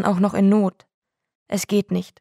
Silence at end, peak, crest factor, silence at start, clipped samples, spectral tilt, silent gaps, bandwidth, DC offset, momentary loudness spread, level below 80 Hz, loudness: 0.15 s; -4 dBFS; 16 dB; 0 s; under 0.1%; -6.5 dB/octave; 0.94-1.02 s, 1.35-1.46 s; 14.5 kHz; under 0.1%; 10 LU; -64 dBFS; -21 LUFS